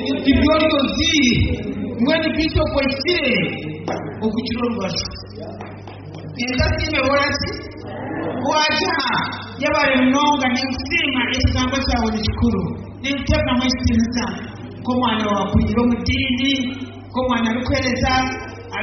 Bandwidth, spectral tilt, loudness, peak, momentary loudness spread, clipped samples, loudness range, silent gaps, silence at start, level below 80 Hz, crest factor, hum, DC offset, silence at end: 6.4 kHz; -3.5 dB/octave; -19 LUFS; -2 dBFS; 13 LU; under 0.1%; 5 LU; none; 0 s; -34 dBFS; 16 dB; none; under 0.1%; 0 s